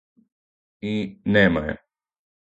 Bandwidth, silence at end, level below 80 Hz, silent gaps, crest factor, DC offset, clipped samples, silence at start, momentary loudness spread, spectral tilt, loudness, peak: 7.8 kHz; 0.75 s; -48 dBFS; none; 22 dB; under 0.1%; under 0.1%; 0.85 s; 16 LU; -7.5 dB/octave; -22 LUFS; -4 dBFS